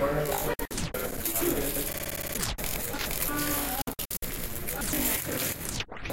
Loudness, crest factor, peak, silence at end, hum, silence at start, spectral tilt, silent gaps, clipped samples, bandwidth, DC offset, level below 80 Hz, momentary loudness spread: -30 LUFS; 18 dB; -14 dBFS; 0 s; none; 0 s; -3 dB/octave; none; under 0.1%; 17 kHz; under 0.1%; -40 dBFS; 6 LU